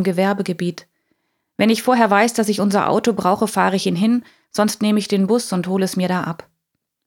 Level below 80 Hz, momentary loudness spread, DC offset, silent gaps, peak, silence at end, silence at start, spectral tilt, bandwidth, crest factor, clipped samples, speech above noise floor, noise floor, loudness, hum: -66 dBFS; 10 LU; under 0.1%; none; -2 dBFS; 0.7 s; 0 s; -5 dB/octave; 17 kHz; 18 dB; under 0.1%; 59 dB; -76 dBFS; -18 LUFS; none